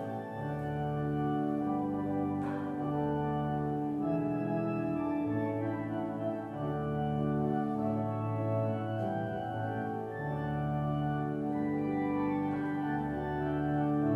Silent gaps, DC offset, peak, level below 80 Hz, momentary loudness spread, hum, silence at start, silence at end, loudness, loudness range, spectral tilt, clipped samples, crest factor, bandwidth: none; under 0.1%; -20 dBFS; -58 dBFS; 4 LU; none; 0 s; 0 s; -34 LUFS; 1 LU; -10 dB/octave; under 0.1%; 14 dB; 4.7 kHz